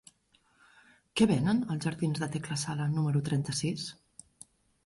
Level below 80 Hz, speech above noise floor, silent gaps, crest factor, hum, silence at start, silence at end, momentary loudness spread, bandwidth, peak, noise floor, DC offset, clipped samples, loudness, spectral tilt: -62 dBFS; 39 dB; none; 22 dB; none; 1.15 s; 0.9 s; 12 LU; 11.5 kHz; -10 dBFS; -69 dBFS; under 0.1%; under 0.1%; -31 LUFS; -5.5 dB/octave